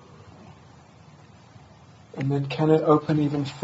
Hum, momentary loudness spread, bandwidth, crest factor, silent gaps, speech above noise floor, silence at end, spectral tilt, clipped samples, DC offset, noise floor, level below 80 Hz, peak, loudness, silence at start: none; 10 LU; 8 kHz; 20 dB; none; 28 dB; 0 s; -8.5 dB/octave; under 0.1%; under 0.1%; -50 dBFS; -62 dBFS; -6 dBFS; -23 LUFS; 0.4 s